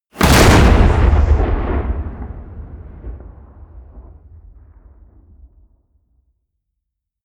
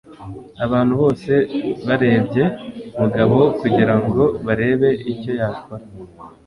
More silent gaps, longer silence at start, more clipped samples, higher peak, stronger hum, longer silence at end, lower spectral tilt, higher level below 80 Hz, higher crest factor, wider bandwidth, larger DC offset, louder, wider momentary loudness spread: neither; about the same, 0.15 s vs 0.1 s; neither; about the same, 0 dBFS vs 0 dBFS; neither; first, 3.25 s vs 0.15 s; second, -5.5 dB/octave vs -9 dB/octave; first, -20 dBFS vs -46 dBFS; about the same, 16 dB vs 18 dB; first, over 20 kHz vs 11 kHz; neither; first, -13 LUFS vs -18 LUFS; first, 26 LU vs 17 LU